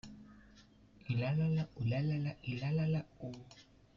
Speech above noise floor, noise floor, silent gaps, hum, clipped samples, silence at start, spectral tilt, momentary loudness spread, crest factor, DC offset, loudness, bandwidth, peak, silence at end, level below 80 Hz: 26 dB; -62 dBFS; none; none; under 0.1%; 0.05 s; -8.5 dB/octave; 21 LU; 12 dB; under 0.1%; -37 LUFS; 7.2 kHz; -26 dBFS; 0.35 s; -64 dBFS